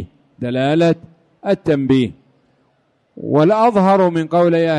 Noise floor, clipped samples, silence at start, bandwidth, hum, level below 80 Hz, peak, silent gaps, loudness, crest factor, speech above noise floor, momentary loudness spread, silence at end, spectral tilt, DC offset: -61 dBFS; under 0.1%; 0 s; 10.5 kHz; none; -52 dBFS; -2 dBFS; none; -15 LUFS; 14 dB; 47 dB; 14 LU; 0 s; -8 dB/octave; under 0.1%